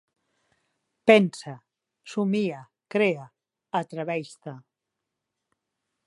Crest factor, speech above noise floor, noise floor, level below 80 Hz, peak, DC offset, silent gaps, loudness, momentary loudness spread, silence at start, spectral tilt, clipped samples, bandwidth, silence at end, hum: 26 dB; 60 dB; -84 dBFS; -78 dBFS; -2 dBFS; under 0.1%; none; -25 LUFS; 23 LU; 1.05 s; -6 dB/octave; under 0.1%; 11.5 kHz; 1.5 s; none